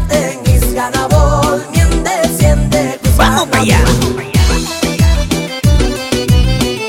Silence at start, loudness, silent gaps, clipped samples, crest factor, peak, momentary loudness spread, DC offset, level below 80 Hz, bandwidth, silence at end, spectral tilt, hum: 0 s; -12 LUFS; none; under 0.1%; 10 dB; 0 dBFS; 5 LU; under 0.1%; -16 dBFS; 17 kHz; 0 s; -5 dB/octave; none